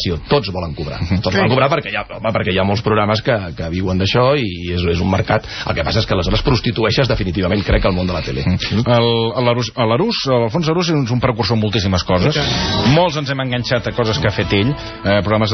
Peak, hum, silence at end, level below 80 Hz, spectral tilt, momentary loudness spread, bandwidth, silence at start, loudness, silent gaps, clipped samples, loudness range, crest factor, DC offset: 0 dBFS; none; 0 s; -32 dBFS; -4.5 dB/octave; 6 LU; 6.4 kHz; 0 s; -16 LUFS; none; under 0.1%; 1 LU; 16 dB; under 0.1%